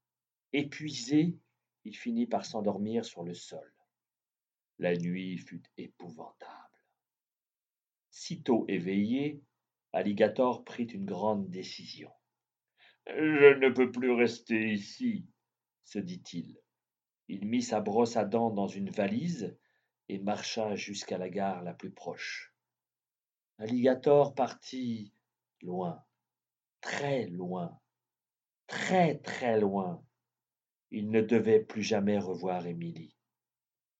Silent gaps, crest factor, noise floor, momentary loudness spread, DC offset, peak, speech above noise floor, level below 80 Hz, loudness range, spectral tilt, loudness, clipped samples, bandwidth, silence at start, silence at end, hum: none; 26 dB; under -90 dBFS; 19 LU; under 0.1%; -6 dBFS; over 59 dB; -84 dBFS; 11 LU; -6 dB/octave; -31 LUFS; under 0.1%; 8.2 kHz; 0.55 s; 0.95 s; none